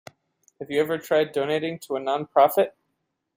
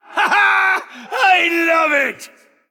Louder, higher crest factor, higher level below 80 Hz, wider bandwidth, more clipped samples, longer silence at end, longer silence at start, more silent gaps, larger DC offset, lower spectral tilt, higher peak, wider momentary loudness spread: second, -24 LUFS vs -14 LUFS; first, 20 dB vs 14 dB; about the same, -72 dBFS vs -76 dBFS; about the same, 16.5 kHz vs 17.5 kHz; neither; first, 0.65 s vs 0.45 s; first, 0.6 s vs 0.1 s; neither; neither; first, -5 dB/octave vs -1.5 dB/octave; second, -6 dBFS vs -2 dBFS; about the same, 9 LU vs 9 LU